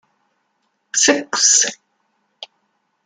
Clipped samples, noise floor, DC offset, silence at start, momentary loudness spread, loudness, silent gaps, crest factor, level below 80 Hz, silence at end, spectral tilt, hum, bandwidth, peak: under 0.1%; -69 dBFS; under 0.1%; 0.95 s; 26 LU; -14 LUFS; none; 20 dB; -70 dBFS; 0.6 s; 1 dB/octave; none; 11 kHz; -2 dBFS